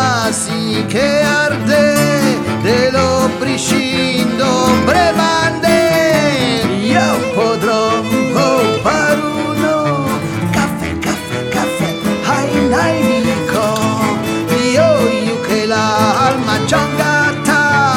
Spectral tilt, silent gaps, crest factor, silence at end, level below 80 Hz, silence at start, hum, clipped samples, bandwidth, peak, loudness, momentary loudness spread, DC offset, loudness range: -4.5 dB/octave; none; 12 dB; 0 s; -40 dBFS; 0 s; none; under 0.1%; 18 kHz; 0 dBFS; -13 LUFS; 5 LU; under 0.1%; 3 LU